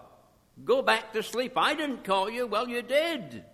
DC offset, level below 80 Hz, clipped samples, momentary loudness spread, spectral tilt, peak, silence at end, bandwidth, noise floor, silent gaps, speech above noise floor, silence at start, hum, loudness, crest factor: under 0.1%; -68 dBFS; under 0.1%; 7 LU; -3.5 dB/octave; -10 dBFS; 0.1 s; 15 kHz; -59 dBFS; none; 31 dB; 0 s; none; -28 LUFS; 20 dB